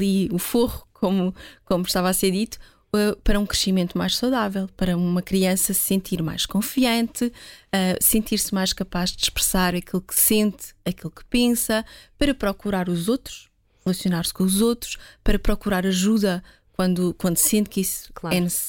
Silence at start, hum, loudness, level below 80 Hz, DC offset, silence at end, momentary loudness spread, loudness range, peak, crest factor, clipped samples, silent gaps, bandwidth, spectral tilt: 0 s; none; -22 LUFS; -36 dBFS; under 0.1%; 0 s; 10 LU; 3 LU; -6 dBFS; 18 dB; under 0.1%; none; 17 kHz; -4 dB/octave